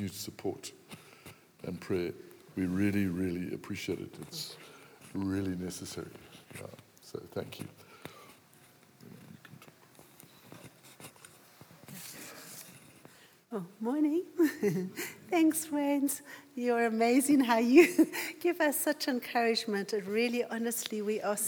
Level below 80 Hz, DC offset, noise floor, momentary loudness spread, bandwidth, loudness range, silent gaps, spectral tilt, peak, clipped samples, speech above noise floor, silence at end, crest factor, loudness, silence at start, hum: -78 dBFS; under 0.1%; -60 dBFS; 24 LU; over 20 kHz; 22 LU; none; -4.5 dB/octave; -8 dBFS; under 0.1%; 29 dB; 0 s; 24 dB; -31 LUFS; 0 s; none